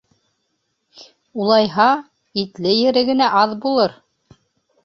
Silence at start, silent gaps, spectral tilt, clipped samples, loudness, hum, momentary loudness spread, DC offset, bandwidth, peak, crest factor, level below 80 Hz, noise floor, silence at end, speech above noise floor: 1 s; none; -6 dB/octave; under 0.1%; -17 LUFS; none; 10 LU; under 0.1%; 6.6 kHz; -2 dBFS; 18 dB; -62 dBFS; -71 dBFS; 0.9 s; 55 dB